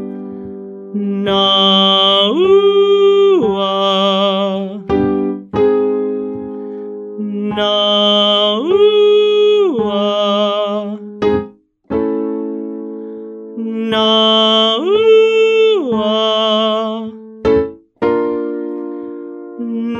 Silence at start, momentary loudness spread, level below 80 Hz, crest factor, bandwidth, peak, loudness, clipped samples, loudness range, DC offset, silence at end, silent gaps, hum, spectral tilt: 0 s; 17 LU; -48 dBFS; 12 dB; 7.6 kHz; 0 dBFS; -13 LUFS; under 0.1%; 7 LU; under 0.1%; 0 s; none; none; -5.5 dB/octave